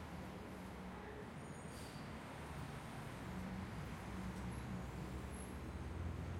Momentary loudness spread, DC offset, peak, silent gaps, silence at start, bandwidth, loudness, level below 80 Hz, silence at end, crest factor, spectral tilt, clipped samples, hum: 4 LU; under 0.1%; -34 dBFS; none; 0 s; 16 kHz; -49 LUFS; -56 dBFS; 0 s; 14 dB; -6 dB/octave; under 0.1%; none